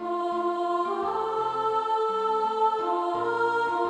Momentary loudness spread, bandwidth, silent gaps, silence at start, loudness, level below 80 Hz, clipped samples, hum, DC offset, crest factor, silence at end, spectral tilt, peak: 3 LU; 10.5 kHz; none; 0 s; -26 LUFS; -70 dBFS; under 0.1%; none; under 0.1%; 12 dB; 0 s; -5 dB/octave; -14 dBFS